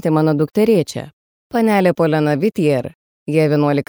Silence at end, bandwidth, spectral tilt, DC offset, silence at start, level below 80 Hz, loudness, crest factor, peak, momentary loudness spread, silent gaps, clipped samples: 0.05 s; over 20 kHz; -7.5 dB/octave; under 0.1%; 0.05 s; -58 dBFS; -16 LUFS; 14 dB; -2 dBFS; 14 LU; 1.13-1.50 s, 2.95-3.26 s; under 0.1%